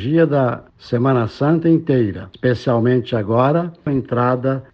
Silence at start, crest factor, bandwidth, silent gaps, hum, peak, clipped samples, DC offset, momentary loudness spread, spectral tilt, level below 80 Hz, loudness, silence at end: 0 s; 14 dB; 6.6 kHz; none; none; -2 dBFS; under 0.1%; under 0.1%; 6 LU; -9.5 dB/octave; -52 dBFS; -18 LUFS; 0.1 s